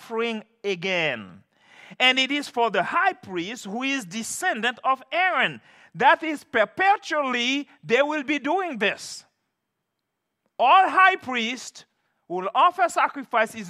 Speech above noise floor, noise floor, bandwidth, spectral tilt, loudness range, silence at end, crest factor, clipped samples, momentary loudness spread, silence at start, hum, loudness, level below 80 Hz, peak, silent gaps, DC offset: 57 dB; -80 dBFS; 14.5 kHz; -2.5 dB/octave; 3 LU; 0 s; 20 dB; under 0.1%; 13 LU; 0 s; none; -22 LUFS; -80 dBFS; -4 dBFS; none; under 0.1%